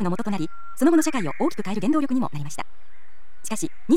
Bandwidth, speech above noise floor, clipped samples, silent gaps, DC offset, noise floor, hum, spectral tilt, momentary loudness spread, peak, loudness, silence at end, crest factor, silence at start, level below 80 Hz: 16 kHz; 19 dB; under 0.1%; none; 5%; -43 dBFS; none; -5.5 dB/octave; 15 LU; -8 dBFS; -25 LUFS; 0 s; 16 dB; 0 s; -60 dBFS